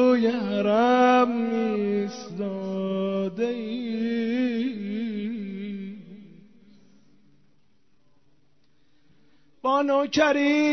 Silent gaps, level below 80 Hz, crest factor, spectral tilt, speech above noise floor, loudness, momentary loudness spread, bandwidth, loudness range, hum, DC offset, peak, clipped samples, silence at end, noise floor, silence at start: none; -68 dBFS; 18 dB; -6 dB/octave; 44 dB; -25 LUFS; 13 LU; 6.4 kHz; 15 LU; none; 0.2%; -8 dBFS; under 0.1%; 0 s; -68 dBFS; 0 s